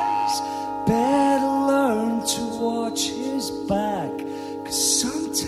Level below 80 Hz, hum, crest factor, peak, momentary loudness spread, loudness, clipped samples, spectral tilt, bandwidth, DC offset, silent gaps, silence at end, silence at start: -52 dBFS; none; 16 dB; -8 dBFS; 9 LU; -23 LUFS; under 0.1%; -3.5 dB/octave; 15 kHz; under 0.1%; none; 0 s; 0 s